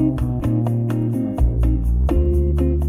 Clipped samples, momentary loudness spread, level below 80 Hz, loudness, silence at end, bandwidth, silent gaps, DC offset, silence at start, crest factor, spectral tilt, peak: under 0.1%; 3 LU; -20 dBFS; -20 LUFS; 0 s; 10.5 kHz; none; under 0.1%; 0 s; 12 dB; -10 dB/octave; -6 dBFS